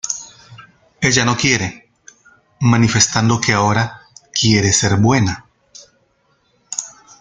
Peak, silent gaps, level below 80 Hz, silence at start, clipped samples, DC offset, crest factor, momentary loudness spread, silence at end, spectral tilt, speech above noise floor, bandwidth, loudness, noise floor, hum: 0 dBFS; none; -46 dBFS; 0.05 s; under 0.1%; under 0.1%; 18 dB; 13 LU; 0.3 s; -3.5 dB/octave; 46 dB; 9.6 kHz; -15 LUFS; -61 dBFS; none